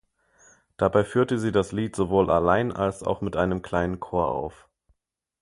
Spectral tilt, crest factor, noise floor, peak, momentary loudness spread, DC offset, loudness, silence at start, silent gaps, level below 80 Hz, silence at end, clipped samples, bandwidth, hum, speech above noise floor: -7 dB/octave; 20 dB; -76 dBFS; -4 dBFS; 7 LU; under 0.1%; -25 LUFS; 0.8 s; none; -46 dBFS; 0.9 s; under 0.1%; 11.5 kHz; none; 52 dB